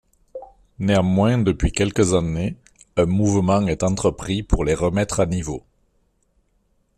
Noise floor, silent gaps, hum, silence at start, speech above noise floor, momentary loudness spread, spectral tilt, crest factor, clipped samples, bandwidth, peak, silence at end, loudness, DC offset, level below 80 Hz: -65 dBFS; none; none; 0.35 s; 46 dB; 15 LU; -6 dB/octave; 18 dB; under 0.1%; 12.5 kHz; -4 dBFS; 1.4 s; -20 LUFS; under 0.1%; -34 dBFS